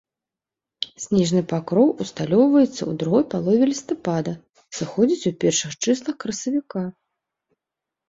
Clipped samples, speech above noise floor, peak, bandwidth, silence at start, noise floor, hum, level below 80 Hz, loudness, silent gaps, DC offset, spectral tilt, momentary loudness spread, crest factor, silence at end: under 0.1%; 67 dB; -4 dBFS; 7.8 kHz; 0.8 s; -88 dBFS; none; -60 dBFS; -21 LUFS; none; under 0.1%; -5.5 dB/octave; 12 LU; 18 dB; 1.2 s